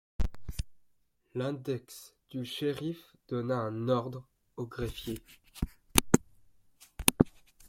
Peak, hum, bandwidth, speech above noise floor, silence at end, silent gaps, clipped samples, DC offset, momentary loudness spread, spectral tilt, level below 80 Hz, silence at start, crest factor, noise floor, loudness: 0 dBFS; none; 16.5 kHz; 36 dB; 0.05 s; none; under 0.1%; under 0.1%; 19 LU; -4.5 dB/octave; -44 dBFS; 0.2 s; 34 dB; -71 dBFS; -33 LUFS